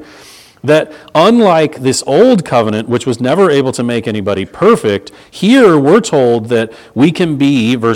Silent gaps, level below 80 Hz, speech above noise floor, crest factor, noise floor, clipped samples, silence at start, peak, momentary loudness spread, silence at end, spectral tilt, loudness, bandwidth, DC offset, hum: none; -52 dBFS; 28 dB; 10 dB; -38 dBFS; 0.4%; 0 s; 0 dBFS; 9 LU; 0 s; -5.5 dB/octave; -11 LUFS; 15.5 kHz; under 0.1%; none